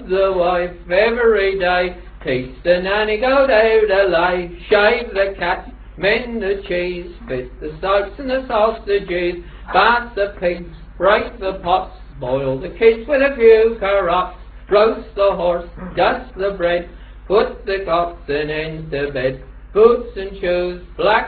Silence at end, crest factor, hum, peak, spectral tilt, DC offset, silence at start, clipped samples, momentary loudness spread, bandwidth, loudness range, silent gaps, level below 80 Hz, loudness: 0 s; 18 dB; none; 0 dBFS; -8.5 dB/octave; under 0.1%; 0 s; under 0.1%; 12 LU; 4.8 kHz; 5 LU; none; -36 dBFS; -17 LUFS